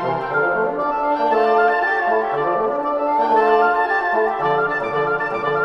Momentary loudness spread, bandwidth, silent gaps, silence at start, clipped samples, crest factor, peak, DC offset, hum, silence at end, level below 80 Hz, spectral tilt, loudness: 5 LU; 6.6 kHz; none; 0 s; under 0.1%; 14 dB; -4 dBFS; under 0.1%; none; 0 s; -52 dBFS; -6.5 dB/octave; -18 LUFS